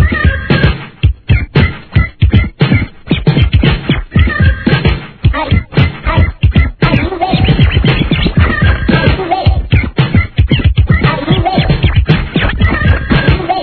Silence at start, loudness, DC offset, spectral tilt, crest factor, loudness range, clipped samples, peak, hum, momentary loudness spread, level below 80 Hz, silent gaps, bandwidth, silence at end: 0 s; -11 LUFS; under 0.1%; -9.5 dB/octave; 10 dB; 1 LU; 0.7%; 0 dBFS; none; 4 LU; -16 dBFS; none; 5.4 kHz; 0 s